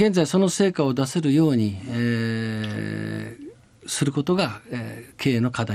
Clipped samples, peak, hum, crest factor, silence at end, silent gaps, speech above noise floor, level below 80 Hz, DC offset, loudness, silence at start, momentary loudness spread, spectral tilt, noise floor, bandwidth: under 0.1%; -8 dBFS; none; 16 dB; 0 s; none; 21 dB; -60 dBFS; under 0.1%; -23 LUFS; 0 s; 13 LU; -5.5 dB/octave; -43 dBFS; 15 kHz